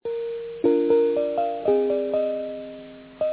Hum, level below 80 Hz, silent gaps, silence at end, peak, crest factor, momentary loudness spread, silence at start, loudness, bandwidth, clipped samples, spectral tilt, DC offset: none; -62 dBFS; none; 0 s; -8 dBFS; 16 dB; 17 LU; 0.05 s; -24 LUFS; 4 kHz; under 0.1%; -10 dB/octave; under 0.1%